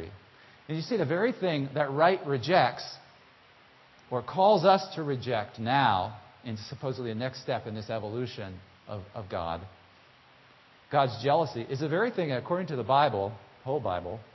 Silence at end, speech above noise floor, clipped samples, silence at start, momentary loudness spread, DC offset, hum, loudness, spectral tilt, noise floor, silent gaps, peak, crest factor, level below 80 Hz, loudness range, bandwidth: 0.1 s; 29 dB; under 0.1%; 0 s; 16 LU; under 0.1%; none; -29 LUFS; -6.5 dB/octave; -58 dBFS; none; -8 dBFS; 22 dB; -60 dBFS; 9 LU; 6.2 kHz